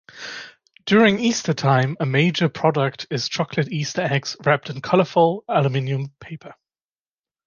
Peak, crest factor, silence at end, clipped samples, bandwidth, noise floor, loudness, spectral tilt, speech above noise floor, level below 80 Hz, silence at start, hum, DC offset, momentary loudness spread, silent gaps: -4 dBFS; 18 dB; 0.95 s; under 0.1%; 7.2 kHz; under -90 dBFS; -20 LUFS; -5.5 dB/octave; over 70 dB; -62 dBFS; 0.15 s; none; under 0.1%; 17 LU; none